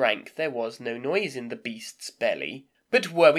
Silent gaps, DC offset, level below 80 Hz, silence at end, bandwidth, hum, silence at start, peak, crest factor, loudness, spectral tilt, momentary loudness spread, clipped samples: none; under 0.1%; -82 dBFS; 0 s; 14.5 kHz; none; 0 s; -4 dBFS; 22 dB; -28 LUFS; -4 dB/octave; 11 LU; under 0.1%